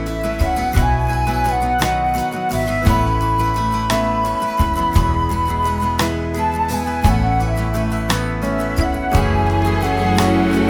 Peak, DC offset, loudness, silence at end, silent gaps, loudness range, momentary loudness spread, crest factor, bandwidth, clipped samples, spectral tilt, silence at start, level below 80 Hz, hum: 0 dBFS; under 0.1%; -18 LUFS; 0 s; none; 1 LU; 4 LU; 16 dB; over 20 kHz; under 0.1%; -6 dB/octave; 0 s; -24 dBFS; none